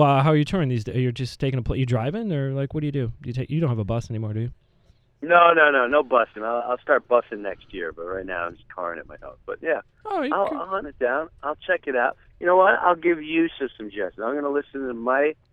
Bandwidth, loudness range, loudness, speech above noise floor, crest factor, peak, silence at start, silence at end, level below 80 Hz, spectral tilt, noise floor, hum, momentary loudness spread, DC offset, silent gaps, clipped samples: 10.5 kHz; 8 LU; -23 LUFS; 36 dB; 22 dB; -2 dBFS; 0 s; 0.2 s; -48 dBFS; -7.5 dB/octave; -59 dBFS; none; 15 LU; under 0.1%; none; under 0.1%